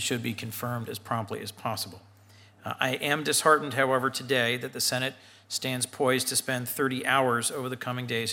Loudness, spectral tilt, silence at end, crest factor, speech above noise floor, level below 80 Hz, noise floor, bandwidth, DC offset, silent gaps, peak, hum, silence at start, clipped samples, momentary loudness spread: -28 LUFS; -3 dB/octave; 0 s; 22 dB; 27 dB; -76 dBFS; -55 dBFS; 17 kHz; under 0.1%; none; -6 dBFS; none; 0 s; under 0.1%; 11 LU